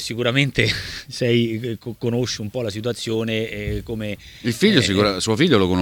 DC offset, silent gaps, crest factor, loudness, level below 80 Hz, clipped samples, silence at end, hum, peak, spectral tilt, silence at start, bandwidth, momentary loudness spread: under 0.1%; none; 20 dB; -21 LUFS; -42 dBFS; under 0.1%; 0 s; none; 0 dBFS; -5 dB/octave; 0 s; 18.5 kHz; 11 LU